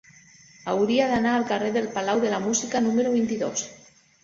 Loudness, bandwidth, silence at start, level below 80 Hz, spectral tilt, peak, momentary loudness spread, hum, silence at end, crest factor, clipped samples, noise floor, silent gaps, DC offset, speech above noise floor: -24 LUFS; 7.8 kHz; 0.65 s; -62 dBFS; -4 dB/octave; -8 dBFS; 7 LU; none; 0.45 s; 16 dB; under 0.1%; -52 dBFS; none; under 0.1%; 29 dB